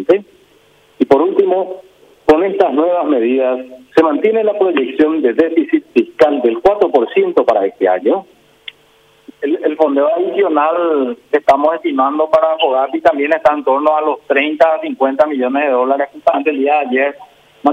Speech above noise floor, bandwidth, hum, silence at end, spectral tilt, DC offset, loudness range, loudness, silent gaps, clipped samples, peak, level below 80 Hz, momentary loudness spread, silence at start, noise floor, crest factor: 37 dB; 8.6 kHz; none; 0 s; -6 dB/octave; under 0.1%; 3 LU; -14 LUFS; none; under 0.1%; 0 dBFS; -54 dBFS; 5 LU; 0 s; -50 dBFS; 14 dB